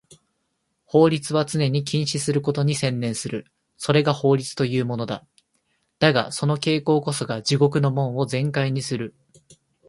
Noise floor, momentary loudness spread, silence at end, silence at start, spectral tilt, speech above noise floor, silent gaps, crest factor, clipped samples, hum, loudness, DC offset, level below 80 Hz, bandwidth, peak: -74 dBFS; 10 LU; 0.8 s; 0.95 s; -5.5 dB/octave; 52 dB; none; 22 dB; under 0.1%; none; -22 LUFS; under 0.1%; -60 dBFS; 11.5 kHz; 0 dBFS